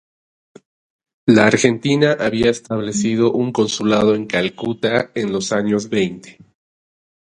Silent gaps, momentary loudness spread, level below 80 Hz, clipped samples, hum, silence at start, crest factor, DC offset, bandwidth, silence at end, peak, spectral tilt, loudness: none; 8 LU; -52 dBFS; under 0.1%; none; 1.25 s; 18 dB; under 0.1%; 10.5 kHz; 1 s; 0 dBFS; -5 dB/octave; -17 LUFS